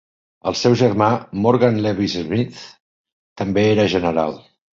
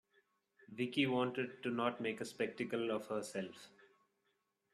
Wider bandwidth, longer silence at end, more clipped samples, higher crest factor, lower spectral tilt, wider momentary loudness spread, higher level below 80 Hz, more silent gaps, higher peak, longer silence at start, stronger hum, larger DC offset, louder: second, 7.6 kHz vs 13.5 kHz; second, 0.4 s vs 1.05 s; neither; about the same, 18 dB vs 20 dB; first, -6.5 dB/octave vs -5 dB/octave; about the same, 12 LU vs 10 LU; first, -48 dBFS vs -84 dBFS; first, 2.80-3.04 s, 3.12-3.36 s vs none; first, -2 dBFS vs -20 dBFS; second, 0.45 s vs 0.7 s; neither; neither; first, -18 LUFS vs -39 LUFS